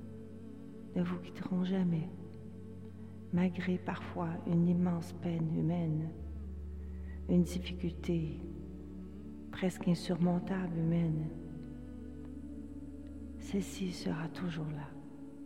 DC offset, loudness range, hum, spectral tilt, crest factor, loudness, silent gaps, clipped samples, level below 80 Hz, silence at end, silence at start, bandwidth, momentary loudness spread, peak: 0.2%; 6 LU; none; -7.5 dB/octave; 18 dB; -36 LUFS; none; under 0.1%; -52 dBFS; 0 s; 0 s; 12 kHz; 16 LU; -18 dBFS